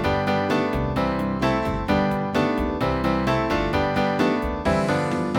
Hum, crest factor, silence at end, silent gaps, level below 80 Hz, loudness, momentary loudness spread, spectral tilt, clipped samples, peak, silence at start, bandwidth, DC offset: none; 16 dB; 0 s; none; -36 dBFS; -23 LUFS; 2 LU; -6.5 dB/octave; under 0.1%; -8 dBFS; 0 s; 17.5 kHz; under 0.1%